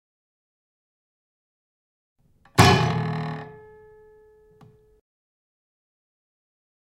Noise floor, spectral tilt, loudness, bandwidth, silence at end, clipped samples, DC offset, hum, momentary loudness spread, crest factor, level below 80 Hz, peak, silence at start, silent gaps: -54 dBFS; -5 dB/octave; -21 LUFS; 16 kHz; 3.45 s; under 0.1%; under 0.1%; none; 20 LU; 28 dB; -52 dBFS; 0 dBFS; 2.55 s; none